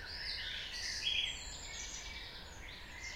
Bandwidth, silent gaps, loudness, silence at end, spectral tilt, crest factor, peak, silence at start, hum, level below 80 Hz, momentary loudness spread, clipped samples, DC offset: 16 kHz; none; -40 LUFS; 0 s; -0.5 dB/octave; 20 dB; -24 dBFS; 0 s; none; -54 dBFS; 14 LU; under 0.1%; under 0.1%